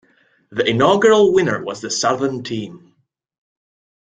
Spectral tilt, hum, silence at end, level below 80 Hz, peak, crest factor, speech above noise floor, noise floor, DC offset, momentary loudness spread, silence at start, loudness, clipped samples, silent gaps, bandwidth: -4.5 dB/octave; none; 1.25 s; -58 dBFS; -2 dBFS; 18 dB; 47 dB; -63 dBFS; under 0.1%; 15 LU; 0.5 s; -17 LUFS; under 0.1%; none; 9.4 kHz